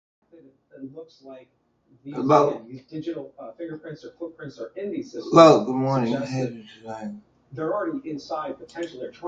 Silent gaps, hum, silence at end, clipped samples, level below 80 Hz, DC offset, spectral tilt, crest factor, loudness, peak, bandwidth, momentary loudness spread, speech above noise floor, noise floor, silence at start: none; none; 0 s; under 0.1%; -66 dBFS; under 0.1%; -6.5 dB/octave; 24 dB; -22 LUFS; 0 dBFS; 7.8 kHz; 23 LU; 30 dB; -54 dBFS; 0.75 s